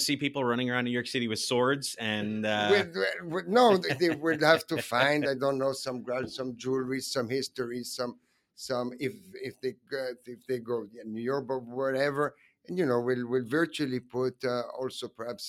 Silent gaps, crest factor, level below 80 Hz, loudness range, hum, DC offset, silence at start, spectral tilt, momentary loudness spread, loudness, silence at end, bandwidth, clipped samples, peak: none; 24 dB; -72 dBFS; 9 LU; none; under 0.1%; 0 s; -4.5 dB/octave; 12 LU; -30 LUFS; 0 s; 16 kHz; under 0.1%; -6 dBFS